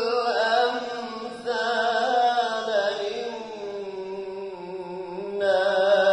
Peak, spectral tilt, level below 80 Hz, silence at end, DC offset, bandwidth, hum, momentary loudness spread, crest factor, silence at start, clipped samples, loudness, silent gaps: -10 dBFS; -3 dB/octave; -68 dBFS; 0 s; under 0.1%; 10.5 kHz; none; 13 LU; 14 dB; 0 s; under 0.1%; -25 LUFS; none